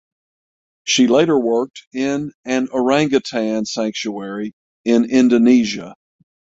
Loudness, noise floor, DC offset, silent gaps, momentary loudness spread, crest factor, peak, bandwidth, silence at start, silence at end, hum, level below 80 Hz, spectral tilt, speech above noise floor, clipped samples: -17 LUFS; under -90 dBFS; under 0.1%; 1.87-1.91 s, 2.34-2.44 s, 4.53-4.84 s; 14 LU; 16 dB; -2 dBFS; 7.8 kHz; 0.85 s; 0.65 s; none; -60 dBFS; -4.5 dB/octave; over 73 dB; under 0.1%